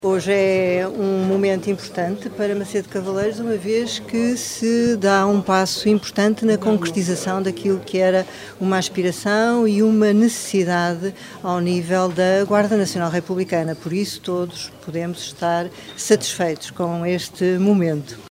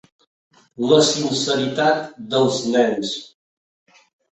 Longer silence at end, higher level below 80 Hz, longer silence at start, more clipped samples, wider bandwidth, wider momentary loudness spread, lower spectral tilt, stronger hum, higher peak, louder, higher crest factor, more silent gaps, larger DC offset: second, 0 s vs 1.1 s; about the same, -60 dBFS vs -62 dBFS; second, 0 s vs 0.8 s; neither; first, 16 kHz vs 8.4 kHz; second, 8 LU vs 11 LU; about the same, -5 dB/octave vs -4 dB/octave; neither; about the same, -2 dBFS vs -2 dBFS; about the same, -20 LUFS vs -19 LUFS; about the same, 18 dB vs 18 dB; neither; neither